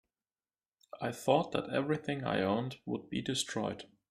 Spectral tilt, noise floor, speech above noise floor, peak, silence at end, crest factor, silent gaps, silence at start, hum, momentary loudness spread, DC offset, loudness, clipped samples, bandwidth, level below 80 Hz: -5 dB/octave; under -90 dBFS; over 56 dB; -12 dBFS; 0.25 s; 24 dB; none; 0.95 s; none; 10 LU; under 0.1%; -34 LUFS; under 0.1%; 15 kHz; -70 dBFS